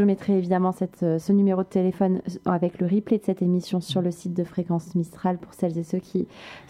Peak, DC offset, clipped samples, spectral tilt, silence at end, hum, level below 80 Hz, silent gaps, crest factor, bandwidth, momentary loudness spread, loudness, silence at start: -8 dBFS; under 0.1%; under 0.1%; -8 dB/octave; 0.1 s; none; -62 dBFS; none; 16 dB; 12 kHz; 7 LU; -25 LUFS; 0 s